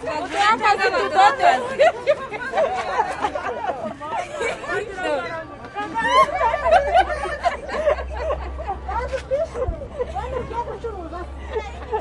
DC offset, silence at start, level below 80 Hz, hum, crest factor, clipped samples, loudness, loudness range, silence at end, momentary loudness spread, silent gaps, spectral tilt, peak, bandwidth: under 0.1%; 0 s; -38 dBFS; none; 20 dB; under 0.1%; -21 LUFS; 8 LU; 0 s; 13 LU; none; -4 dB/octave; -2 dBFS; 11.5 kHz